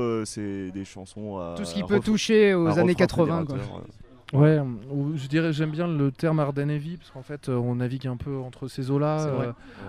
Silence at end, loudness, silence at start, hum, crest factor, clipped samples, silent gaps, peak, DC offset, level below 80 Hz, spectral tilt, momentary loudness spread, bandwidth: 0 s; -25 LUFS; 0 s; none; 18 dB; under 0.1%; none; -6 dBFS; under 0.1%; -52 dBFS; -7 dB/octave; 16 LU; 12 kHz